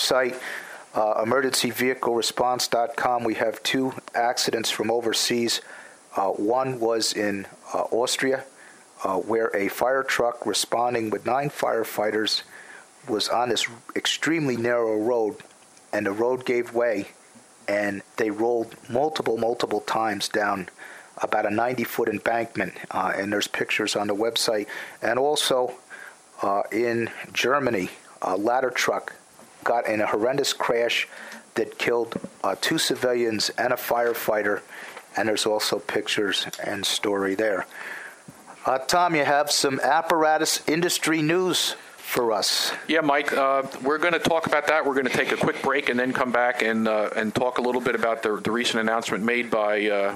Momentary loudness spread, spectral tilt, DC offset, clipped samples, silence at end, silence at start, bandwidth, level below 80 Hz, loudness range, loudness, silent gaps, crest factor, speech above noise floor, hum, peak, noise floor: 9 LU; -3 dB/octave; under 0.1%; under 0.1%; 0 s; 0 s; 16 kHz; -66 dBFS; 4 LU; -24 LUFS; none; 22 dB; 27 dB; none; -2 dBFS; -51 dBFS